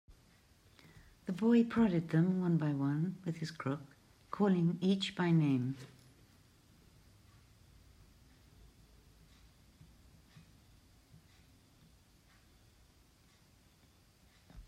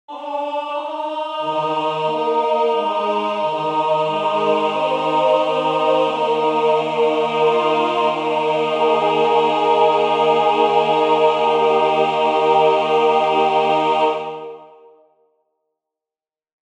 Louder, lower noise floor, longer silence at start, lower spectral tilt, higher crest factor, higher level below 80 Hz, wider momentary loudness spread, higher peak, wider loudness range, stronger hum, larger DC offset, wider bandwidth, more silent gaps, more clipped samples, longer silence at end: second, -33 LUFS vs -17 LUFS; second, -66 dBFS vs under -90 dBFS; about the same, 0.1 s vs 0.1 s; first, -7.5 dB/octave vs -5 dB/octave; about the same, 18 dB vs 14 dB; about the same, -68 dBFS vs -66 dBFS; first, 14 LU vs 8 LU; second, -20 dBFS vs -2 dBFS; about the same, 5 LU vs 5 LU; neither; neither; first, 10.5 kHz vs 9.4 kHz; neither; neither; second, 0.05 s vs 2.1 s